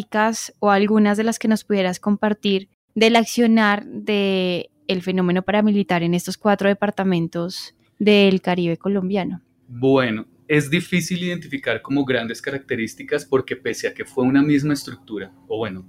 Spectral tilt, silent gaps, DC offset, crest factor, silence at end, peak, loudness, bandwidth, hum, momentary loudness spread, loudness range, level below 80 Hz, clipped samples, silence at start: -5.5 dB/octave; 2.74-2.88 s; under 0.1%; 14 dB; 0.05 s; -4 dBFS; -20 LUFS; 15.5 kHz; none; 11 LU; 4 LU; -58 dBFS; under 0.1%; 0 s